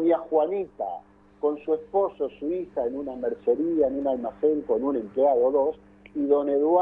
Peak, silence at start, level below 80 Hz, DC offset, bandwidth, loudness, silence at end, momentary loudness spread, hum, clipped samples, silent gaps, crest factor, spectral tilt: -10 dBFS; 0 s; -60 dBFS; under 0.1%; 3.7 kHz; -26 LUFS; 0 s; 9 LU; 50 Hz at -55 dBFS; under 0.1%; none; 16 dB; -9.5 dB/octave